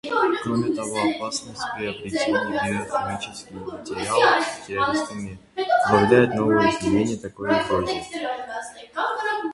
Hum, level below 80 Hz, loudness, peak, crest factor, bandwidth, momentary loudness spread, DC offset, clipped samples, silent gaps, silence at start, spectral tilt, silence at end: none; -52 dBFS; -23 LUFS; -2 dBFS; 20 dB; 11.5 kHz; 14 LU; under 0.1%; under 0.1%; none; 0.05 s; -4.5 dB/octave; 0 s